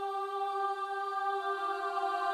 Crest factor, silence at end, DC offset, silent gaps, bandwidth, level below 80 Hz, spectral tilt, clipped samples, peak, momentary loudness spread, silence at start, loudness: 14 dB; 0 s; under 0.1%; none; 13 kHz; -82 dBFS; -1 dB/octave; under 0.1%; -20 dBFS; 2 LU; 0 s; -34 LUFS